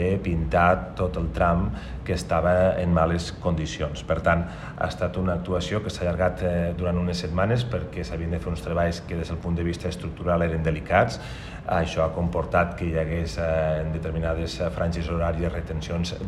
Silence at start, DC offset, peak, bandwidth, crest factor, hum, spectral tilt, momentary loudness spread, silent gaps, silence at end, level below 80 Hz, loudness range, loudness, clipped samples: 0 s; under 0.1%; -6 dBFS; 12 kHz; 18 dB; none; -6.5 dB/octave; 8 LU; none; 0 s; -38 dBFS; 3 LU; -25 LUFS; under 0.1%